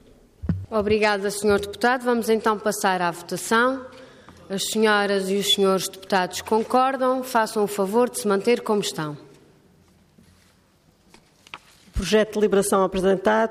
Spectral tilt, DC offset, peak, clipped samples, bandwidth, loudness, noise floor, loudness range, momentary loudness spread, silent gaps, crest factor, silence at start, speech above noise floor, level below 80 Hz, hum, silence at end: -4 dB/octave; under 0.1%; -8 dBFS; under 0.1%; 15.5 kHz; -22 LUFS; -59 dBFS; 7 LU; 12 LU; none; 16 dB; 0.45 s; 38 dB; -46 dBFS; none; 0 s